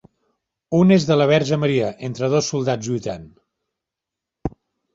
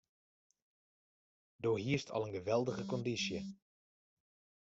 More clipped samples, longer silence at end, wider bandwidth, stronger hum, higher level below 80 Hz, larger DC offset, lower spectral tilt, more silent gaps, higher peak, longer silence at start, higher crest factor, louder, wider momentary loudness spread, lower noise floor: neither; second, 0.45 s vs 1.1 s; about the same, 7.8 kHz vs 8 kHz; neither; first, -50 dBFS vs -74 dBFS; neither; about the same, -6 dB/octave vs -5 dB/octave; neither; first, -4 dBFS vs -22 dBFS; second, 0.7 s vs 1.6 s; about the same, 18 dB vs 20 dB; first, -19 LUFS vs -38 LUFS; first, 17 LU vs 5 LU; second, -85 dBFS vs under -90 dBFS